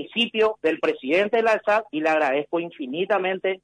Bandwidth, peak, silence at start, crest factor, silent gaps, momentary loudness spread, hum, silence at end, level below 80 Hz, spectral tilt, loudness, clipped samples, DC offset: 10 kHz; -10 dBFS; 0 s; 12 dB; none; 7 LU; none; 0.1 s; -68 dBFS; -5 dB/octave; -22 LUFS; under 0.1%; under 0.1%